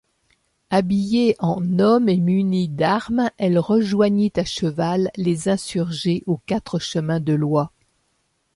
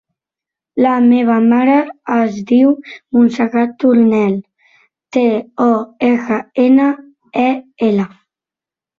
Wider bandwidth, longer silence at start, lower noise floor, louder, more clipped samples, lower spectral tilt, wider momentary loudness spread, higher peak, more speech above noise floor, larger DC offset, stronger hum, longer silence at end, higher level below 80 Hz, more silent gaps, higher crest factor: first, 11.5 kHz vs 6.8 kHz; about the same, 0.7 s vs 0.75 s; second, -68 dBFS vs -88 dBFS; second, -20 LUFS vs -14 LUFS; neither; about the same, -6.5 dB/octave vs -7.5 dB/octave; about the same, 6 LU vs 8 LU; about the same, -4 dBFS vs -2 dBFS; second, 49 dB vs 76 dB; neither; neither; about the same, 0.85 s vs 0.9 s; first, -54 dBFS vs -60 dBFS; neither; about the same, 16 dB vs 12 dB